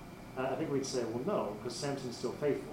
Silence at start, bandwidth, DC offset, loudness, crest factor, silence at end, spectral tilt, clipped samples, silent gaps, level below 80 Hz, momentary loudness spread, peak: 0 s; 16 kHz; under 0.1%; -37 LUFS; 16 dB; 0 s; -5 dB/octave; under 0.1%; none; -62 dBFS; 4 LU; -20 dBFS